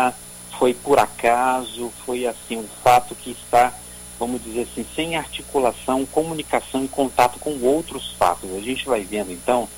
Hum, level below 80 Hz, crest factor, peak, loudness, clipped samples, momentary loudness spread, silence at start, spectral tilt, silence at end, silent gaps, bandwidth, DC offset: 60 Hz at -45 dBFS; -48 dBFS; 20 dB; 0 dBFS; -21 LUFS; under 0.1%; 12 LU; 0 s; -3.5 dB/octave; 0 s; none; 17 kHz; under 0.1%